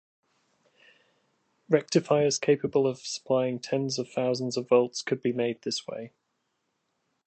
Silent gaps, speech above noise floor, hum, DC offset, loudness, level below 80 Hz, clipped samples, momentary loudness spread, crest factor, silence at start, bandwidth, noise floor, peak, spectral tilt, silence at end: none; 51 dB; none; under 0.1%; -27 LUFS; -74 dBFS; under 0.1%; 9 LU; 20 dB; 1.7 s; 9 kHz; -78 dBFS; -8 dBFS; -4.5 dB/octave; 1.2 s